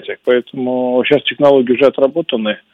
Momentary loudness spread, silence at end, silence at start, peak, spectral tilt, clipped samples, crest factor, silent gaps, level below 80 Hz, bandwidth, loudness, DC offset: 7 LU; 0.15 s; 0 s; 0 dBFS; -7 dB/octave; 0.1%; 14 dB; none; -60 dBFS; 5.6 kHz; -14 LUFS; under 0.1%